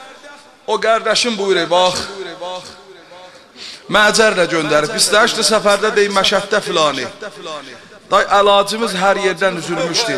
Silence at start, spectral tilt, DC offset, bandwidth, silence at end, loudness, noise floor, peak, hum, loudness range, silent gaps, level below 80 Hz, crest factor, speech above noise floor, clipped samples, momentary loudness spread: 0 s; -2.5 dB/octave; 0.1%; 14.5 kHz; 0 s; -14 LUFS; -40 dBFS; 0 dBFS; none; 5 LU; none; -50 dBFS; 16 dB; 25 dB; under 0.1%; 18 LU